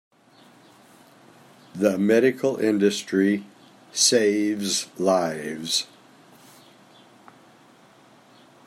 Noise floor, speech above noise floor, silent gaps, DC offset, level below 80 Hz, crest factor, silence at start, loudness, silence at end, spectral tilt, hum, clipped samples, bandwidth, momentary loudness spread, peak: -54 dBFS; 32 dB; none; under 0.1%; -76 dBFS; 20 dB; 1.75 s; -22 LUFS; 2.8 s; -3.5 dB/octave; none; under 0.1%; 16 kHz; 10 LU; -6 dBFS